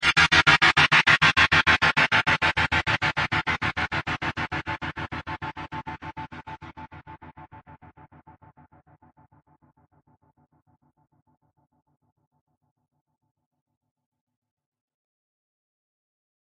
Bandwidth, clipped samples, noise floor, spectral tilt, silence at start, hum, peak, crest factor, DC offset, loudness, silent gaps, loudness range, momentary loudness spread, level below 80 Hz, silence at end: 10.5 kHz; under 0.1%; -57 dBFS; -3 dB/octave; 0 s; none; -2 dBFS; 24 dB; under 0.1%; -20 LUFS; none; 23 LU; 21 LU; -48 dBFS; 8.75 s